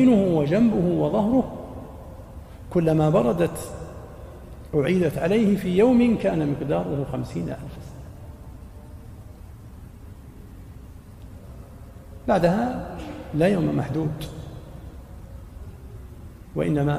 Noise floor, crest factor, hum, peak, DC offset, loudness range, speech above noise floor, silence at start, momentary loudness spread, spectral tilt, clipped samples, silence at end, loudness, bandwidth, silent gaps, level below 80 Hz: -42 dBFS; 16 dB; none; -8 dBFS; under 0.1%; 21 LU; 21 dB; 0 s; 24 LU; -8 dB/octave; under 0.1%; 0 s; -22 LUFS; 15.5 kHz; none; -44 dBFS